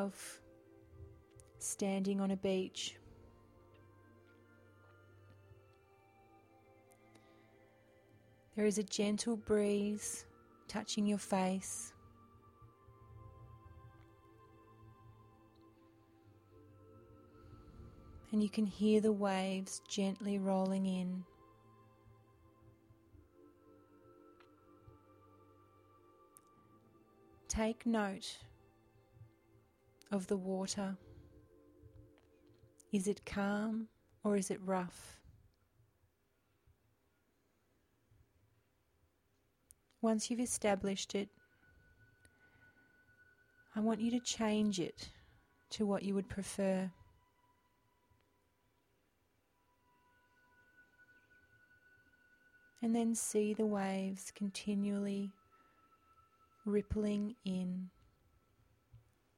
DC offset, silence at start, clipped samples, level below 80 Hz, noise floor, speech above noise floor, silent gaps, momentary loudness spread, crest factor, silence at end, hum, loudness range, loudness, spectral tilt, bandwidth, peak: under 0.1%; 0 s; under 0.1%; -66 dBFS; -78 dBFS; 41 dB; none; 23 LU; 22 dB; 0.4 s; none; 9 LU; -38 LUFS; -5 dB/octave; 15.5 kHz; -20 dBFS